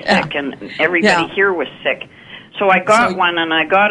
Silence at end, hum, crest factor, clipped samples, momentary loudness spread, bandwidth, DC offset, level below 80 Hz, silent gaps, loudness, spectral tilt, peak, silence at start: 0 s; none; 16 dB; under 0.1%; 12 LU; 11.5 kHz; under 0.1%; -54 dBFS; none; -15 LUFS; -4 dB/octave; 0 dBFS; 0 s